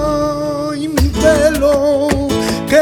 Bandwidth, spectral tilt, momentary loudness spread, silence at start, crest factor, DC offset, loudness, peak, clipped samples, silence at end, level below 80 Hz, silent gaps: 19 kHz; -5.5 dB/octave; 7 LU; 0 s; 12 dB; under 0.1%; -14 LUFS; 0 dBFS; under 0.1%; 0 s; -26 dBFS; none